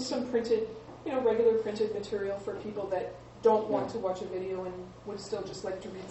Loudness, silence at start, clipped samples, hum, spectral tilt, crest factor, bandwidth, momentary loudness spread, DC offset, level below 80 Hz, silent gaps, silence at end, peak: -32 LUFS; 0 s; under 0.1%; none; -5.5 dB/octave; 18 dB; 8.4 kHz; 14 LU; under 0.1%; -60 dBFS; none; 0 s; -12 dBFS